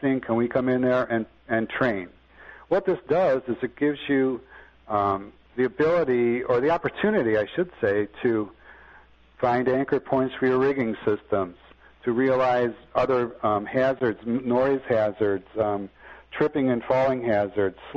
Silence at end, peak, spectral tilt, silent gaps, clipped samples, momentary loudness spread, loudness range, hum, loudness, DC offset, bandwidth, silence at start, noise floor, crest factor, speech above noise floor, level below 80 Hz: 0 s; -8 dBFS; -8.5 dB/octave; none; under 0.1%; 6 LU; 2 LU; none; -24 LUFS; under 0.1%; 6.8 kHz; 0 s; -53 dBFS; 18 dB; 29 dB; -56 dBFS